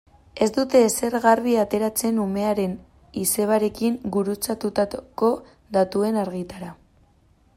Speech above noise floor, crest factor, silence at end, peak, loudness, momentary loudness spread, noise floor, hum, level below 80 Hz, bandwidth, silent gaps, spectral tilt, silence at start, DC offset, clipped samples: 37 dB; 20 dB; 0.85 s; -4 dBFS; -22 LUFS; 13 LU; -59 dBFS; none; -54 dBFS; 16 kHz; none; -4.5 dB/octave; 0.35 s; under 0.1%; under 0.1%